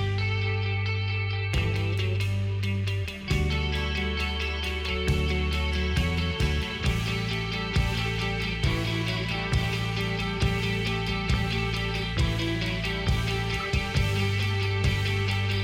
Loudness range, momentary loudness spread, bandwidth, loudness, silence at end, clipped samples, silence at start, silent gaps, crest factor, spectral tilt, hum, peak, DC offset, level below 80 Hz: 1 LU; 2 LU; 16 kHz; -27 LUFS; 0 s; under 0.1%; 0 s; none; 16 dB; -5.5 dB/octave; none; -12 dBFS; under 0.1%; -34 dBFS